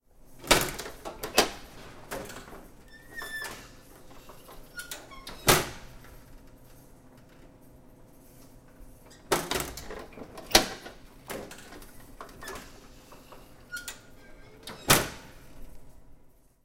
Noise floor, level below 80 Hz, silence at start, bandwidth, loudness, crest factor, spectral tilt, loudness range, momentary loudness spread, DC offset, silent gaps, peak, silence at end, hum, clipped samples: -56 dBFS; -48 dBFS; 0.2 s; 16.5 kHz; -28 LUFS; 30 dB; -2 dB/octave; 13 LU; 28 LU; under 0.1%; none; -4 dBFS; 0.4 s; none; under 0.1%